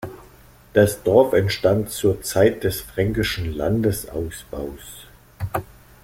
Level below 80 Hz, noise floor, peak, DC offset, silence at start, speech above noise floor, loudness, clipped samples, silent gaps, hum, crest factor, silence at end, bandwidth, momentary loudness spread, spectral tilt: -42 dBFS; -48 dBFS; -2 dBFS; under 0.1%; 0 s; 28 dB; -21 LUFS; under 0.1%; none; none; 20 dB; 0.4 s; 16.5 kHz; 16 LU; -5.5 dB/octave